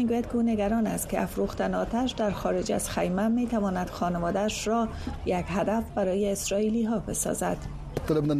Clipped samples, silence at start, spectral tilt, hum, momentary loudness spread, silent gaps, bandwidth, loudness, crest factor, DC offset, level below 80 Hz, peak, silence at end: under 0.1%; 0 s; -5.5 dB/octave; none; 4 LU; none; 14.5 kHz; -28 LUFS; 16 dB; under 0.1%; -44 dBFS; -12 dBFS; 0 s